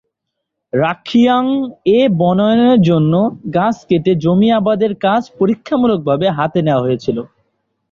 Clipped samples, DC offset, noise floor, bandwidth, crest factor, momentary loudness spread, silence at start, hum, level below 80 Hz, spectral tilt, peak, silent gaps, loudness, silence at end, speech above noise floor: under 0.1%; under 0.1%; -76 dBFS; 7.2 kHz; 12 dB; 6 LU; 0.75 s; none; -52 dBFS; -8 dB/octave; -2 dBFS; none; -14 LUFS; 0.65 s; 63 dB